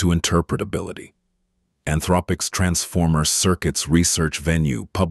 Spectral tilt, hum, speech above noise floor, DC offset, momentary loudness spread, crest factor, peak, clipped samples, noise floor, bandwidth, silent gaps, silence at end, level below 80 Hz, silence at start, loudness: -4.5 dB/octave; none; 50 dB; under 0.1%; 9 LU; 18 dB; -4 dBFS; under 0.1%; -70 dBFS; 12.5 kHz; none; 0 s; -36 dBFS; 0 s; -20 LUFS